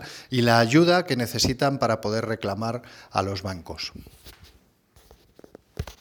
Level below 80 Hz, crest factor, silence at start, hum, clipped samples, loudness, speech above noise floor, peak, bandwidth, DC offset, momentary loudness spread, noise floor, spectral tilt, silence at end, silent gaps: -50 dBFS; 22 dB; 0 s; none; under 0.1%; -24 LUFS; 35 dB; -4 dBFS; over 20 kHz; under 0.1%; 18 LU; -58 dBFS; -5 dB/octave; 0.1 s; none